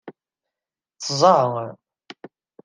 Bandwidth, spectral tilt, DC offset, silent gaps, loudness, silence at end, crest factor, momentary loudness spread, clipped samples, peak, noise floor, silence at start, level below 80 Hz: 10 kHz; -4.5 dB/octave; under 0.1%; none; -19 LUFS; 0.9 s; 22 dB; 16 LU; under 0.1%; -2 dBFS; -89 dBFS; 0.05 s; -74 dBFS